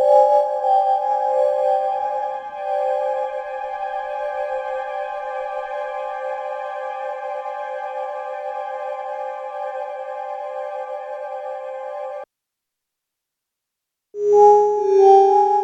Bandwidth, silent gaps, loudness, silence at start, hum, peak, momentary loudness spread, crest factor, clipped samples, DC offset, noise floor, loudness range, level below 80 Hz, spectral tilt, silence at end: 8 kHz; none; -21 LUFS; 0 s; none; -2 dBFS; 16 LU; 18 dB; under 0.1%; under 0.1%; -83 dBFS; 12 LU; -68 dBFS; -4.5 dB/octave; 0 s